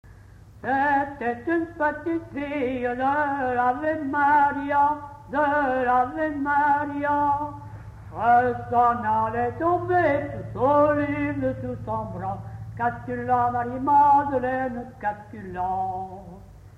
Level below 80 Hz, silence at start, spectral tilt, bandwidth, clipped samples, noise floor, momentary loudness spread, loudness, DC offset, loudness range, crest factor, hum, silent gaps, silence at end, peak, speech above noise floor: -50 dBFS; 0.05 s; -8 dB/octave; 7.6 kHz; under 0.1%; -47 dBFS; 12 LU; -24 LUFS; under 0.1%; 3 LU; 14 dB; none; none; 0.1 s; -10 dBFS; 24 dB